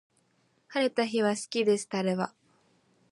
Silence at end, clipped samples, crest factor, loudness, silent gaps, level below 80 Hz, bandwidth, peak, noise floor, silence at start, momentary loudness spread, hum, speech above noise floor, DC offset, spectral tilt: 0.85 s; under 0.1%; 18 dB; -29 LUFS; none; -80 dBFS; 11.5 kHz; -12 dBFS; -70 dBFS; 0.7 s; 7 LU; none; 42 dB; under 0.1%; -4.5 dB/octave